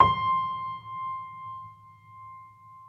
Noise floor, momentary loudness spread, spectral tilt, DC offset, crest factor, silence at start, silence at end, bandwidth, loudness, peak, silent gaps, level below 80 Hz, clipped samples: -51 dBFS; 22 LU; -6.5 dB/octave; under 0.1%; 26 dB; 0 s; 0 s; 5.8 kHz; -30 LUFS; -4 dBFS; none; -56 dBFS; under 0.1%